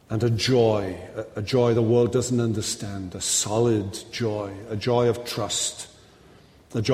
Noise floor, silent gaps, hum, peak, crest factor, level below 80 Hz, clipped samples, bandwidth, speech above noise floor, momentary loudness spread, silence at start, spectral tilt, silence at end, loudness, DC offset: -52 dBFS; none; none; -8 dBFS; 16 dB; -54 dBFS; under 0.1%; 15.5 kHz; 28 dB; 12 LU; 0.1 s; -5 dB/octave; 0 s; -24 LUFS; under 0.1%